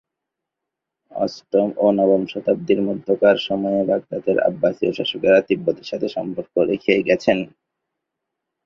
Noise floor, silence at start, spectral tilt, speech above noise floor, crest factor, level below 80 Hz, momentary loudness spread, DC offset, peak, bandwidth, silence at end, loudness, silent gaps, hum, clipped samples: -83 dBFS; 1.15 s; -6.5 dB/octave; 64 dB; 18 dB; -60 dBFS; 9 LU; under 0.1%; -2 dBFS; 7 kHz; 1.2 s; -20 LUFS; none; none; under 0.1%